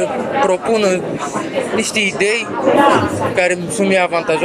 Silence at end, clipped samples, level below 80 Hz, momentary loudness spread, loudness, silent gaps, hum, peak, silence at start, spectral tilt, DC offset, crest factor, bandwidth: 0 s; under 0.1%; -50 dBFS; 7 LU; -15 LUFS; none; none; 0 dBFS; 0 s; -4 dB/octave; under 0.1%; 16 dB; 15 kHz